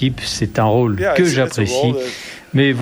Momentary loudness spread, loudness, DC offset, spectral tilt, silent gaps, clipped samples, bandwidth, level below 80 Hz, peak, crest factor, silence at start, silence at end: 8 LU; -17 LUFS; under 0.1%; -5.5 dB/octave; none; under 0.1%; over 20 kHz; -42 dBFS; -2 dBFS; 14 dB; 0 s; 0 s